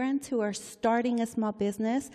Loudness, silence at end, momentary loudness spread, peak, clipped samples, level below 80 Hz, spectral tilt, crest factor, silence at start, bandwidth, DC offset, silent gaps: -30 LUFS; 0 s; 4 LU; -14 dBFS; under 0.1%; -68 dBFS; -5 dB/octave; 14 dB; 0 s; 14 kHz; under 0.1%; none